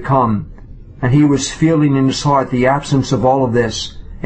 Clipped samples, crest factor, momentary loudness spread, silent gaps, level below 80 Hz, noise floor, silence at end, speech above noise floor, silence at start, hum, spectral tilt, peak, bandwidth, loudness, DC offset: under 0.1%; 14 dB; 9 LU; none; -36 dBFS; -34 dBFS; 0 s; 21 dB; 0 s; none; -6 dB/octave; -2 dBFS; 8.6 kHz; -14 LUFS; under 0.1%